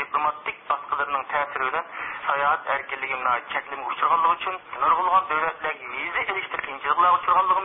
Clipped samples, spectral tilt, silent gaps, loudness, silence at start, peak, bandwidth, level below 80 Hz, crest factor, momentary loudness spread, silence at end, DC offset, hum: under 0.1%; -7 dB/octave; none; -24 LUFS; 0 s; -8 dBFS; 3.9 kHz; -62 dBFS; 16 dB; 10 LU; 0 s; under 0.1%; none